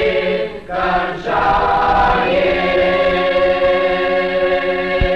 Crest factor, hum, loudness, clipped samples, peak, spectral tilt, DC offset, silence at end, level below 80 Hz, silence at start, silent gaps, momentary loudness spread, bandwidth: 10 dB; none; -15 LUFS; under 0.1%; -4 dBFS; -6.5 dB/octave; 0.8%; 0 s; -30 dBFS; 0 s; none; 5 LU; 7 kHz